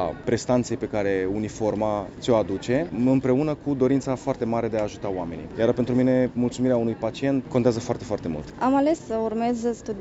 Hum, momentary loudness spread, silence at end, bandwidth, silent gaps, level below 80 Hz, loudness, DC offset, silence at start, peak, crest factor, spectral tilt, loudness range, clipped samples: none; 7 LU; 0 s; 8 kHz; none; -50 dBFS; -24 LUFS; under 0.1%; 0 s; -6 dBFS; 18 dB; -7 dB/octave; 1 LU; under 0.1%